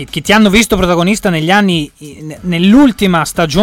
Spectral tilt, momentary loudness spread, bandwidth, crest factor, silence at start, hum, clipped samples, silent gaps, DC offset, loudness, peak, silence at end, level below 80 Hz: -5 dB/octave; 15 LU; 17 kHz; 10 dB; 0 s; none; under 0.1%; none; under 0.1%; -10 LUFS; 0 dBFS; 0 s; -32 dBFS